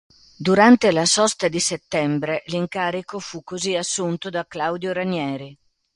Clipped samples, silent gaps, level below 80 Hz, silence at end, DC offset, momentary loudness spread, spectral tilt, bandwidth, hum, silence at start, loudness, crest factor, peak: under 0.1%; none; -60 dBFS; 0.4 s; under 0.1%; 14 LU; -3.5 dB/octave; 11.5 kHz; none; 0.4 s; -20 LUFS; 20 dB; 0 dBFS